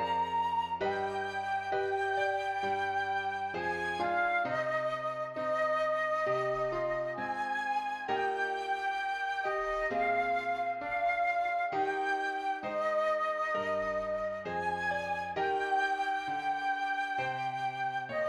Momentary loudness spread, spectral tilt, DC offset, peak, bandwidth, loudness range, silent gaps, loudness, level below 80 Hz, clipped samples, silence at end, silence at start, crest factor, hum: 4 LU; -4.5 dB/octave; under 0.1%; -18 dBFS; 12 kHz; 1 LU; none; -32 LUFS; -64 dBFS; under 0.1%; 0 s; 0 s; 14 dB; none